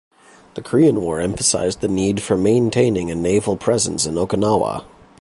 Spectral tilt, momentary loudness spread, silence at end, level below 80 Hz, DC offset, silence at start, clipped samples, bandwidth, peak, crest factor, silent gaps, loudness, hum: -5 dB/octave; 6 LU; 0.35 s; -44 dBFS; under 0.1%; 0.55 s; under 0.1%; 11.5 kHz; -2 dBFS; 16 dB; none; -18 LUFS; none